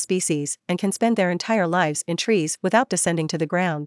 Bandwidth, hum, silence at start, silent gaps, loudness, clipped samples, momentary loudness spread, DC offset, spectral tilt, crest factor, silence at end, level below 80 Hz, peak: 12 kHz; none; 0 s; none; -22 LUFS; under 0.1%; 5 LU; under 0.1%; -4.5 dB/octave; 18 dB; 0 s; -70 dBFS; -4 dBFS